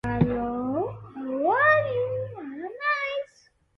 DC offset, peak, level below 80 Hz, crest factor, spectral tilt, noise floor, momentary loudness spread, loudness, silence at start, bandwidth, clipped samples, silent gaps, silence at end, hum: under 0.1%; -8 dBFS; -50 dBFS; 20 dB; -8 dB/octave; -61 dBFS; 16 LU; -25 LUFS; 0.05 s; 7.4 kHz; under 0.1%; none; 0.55 s; none